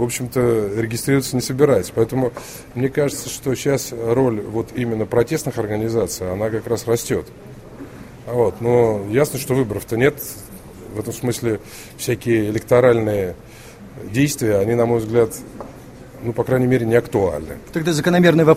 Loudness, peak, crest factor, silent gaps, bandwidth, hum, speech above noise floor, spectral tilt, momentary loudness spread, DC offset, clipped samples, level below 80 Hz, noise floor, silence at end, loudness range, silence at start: -19 LUFS; 0 dBFS; 18 dB; none; 16 kHz; none; 20 dB; -6 dB/octave; 20 LU; under 0.1%; under 0.1%; -46 dBFS; -38 dBFS; 0 s; 3 LU; 0 s